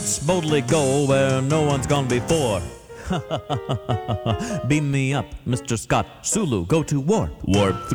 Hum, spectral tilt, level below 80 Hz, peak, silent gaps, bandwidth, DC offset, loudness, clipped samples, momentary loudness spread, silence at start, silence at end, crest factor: none; -5 dB/octave; -42 dBFS; -6 dBFS; none; 17 kHz; 0.1%; -22 LUFS; under 0.1%; 8 LU; 0 s; 0 s; 14 dB